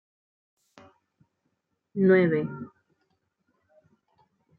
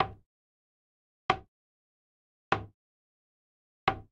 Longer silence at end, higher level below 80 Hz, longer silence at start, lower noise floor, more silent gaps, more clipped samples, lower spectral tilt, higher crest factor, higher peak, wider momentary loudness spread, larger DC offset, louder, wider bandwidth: first, 1.95 s vs 0.1 s; second, -78 dBFS vs -58 dBFS; first, 1.95 s vs 0 s; second, -78 dBFS vs under -90 dBFS; second, none vs 0.26-1.29 s, 1.48-2.51 s, 2.74-3.87 s; neither; first, -10 dB/octave vs -5 dB/octave; second, 20 dB vs 28 dB; about the same, -10 dBFS vs -10 dBFS; first, 22 LU vs 6 LU; neither; first, -24 LUFS vs -34 LUFS; second, 4.3 kHz vs 8.8 kHz